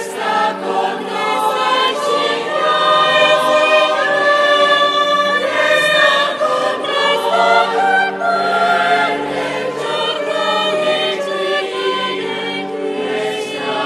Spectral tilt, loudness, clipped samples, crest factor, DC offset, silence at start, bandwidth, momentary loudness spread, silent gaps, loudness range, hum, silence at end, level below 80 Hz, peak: -2.5 dB/octave; -15 LUFS; under 0.1%; 14 dB; under 0.1%; 0 s; 14 kHz; 8 LU; none; 5 LU; none; 0 s; -66 dBFS; 0 dBFS